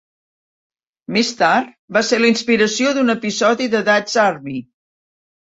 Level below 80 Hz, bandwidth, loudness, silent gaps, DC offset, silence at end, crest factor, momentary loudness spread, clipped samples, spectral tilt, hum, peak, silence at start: -62 dBFS; 8 kHz; -16 LUFS; 1.79-1.88 s; under 0.1%; 0.9 s; 16 dB; 6 LU; under 0.1%; -3.5 dB/octave; none; -2 dBFS; 1.1 s